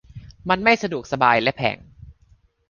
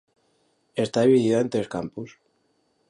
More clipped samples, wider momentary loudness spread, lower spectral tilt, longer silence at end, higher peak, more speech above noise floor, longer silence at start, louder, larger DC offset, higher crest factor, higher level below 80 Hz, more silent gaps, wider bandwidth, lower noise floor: neither; second, 13 LU vs 18 LU; second, -5 dB/octave vs -6.5 dB/octave; second, 0.6 s vs 0.8 s; first, -2 dBFS vs -8 dBFS; second, 37 dB vs 46 dB; second, 0.15 s vs 0.75 s; first, -20 LUFS vs -23 LUFS; neither; about the same, 20 dB vs 18 dB; first, -50 dBFS vs -64 dBFS; neither; second, 7.2 kHz vs 11 kHz; second, -57 dBFS vs -69 dBFS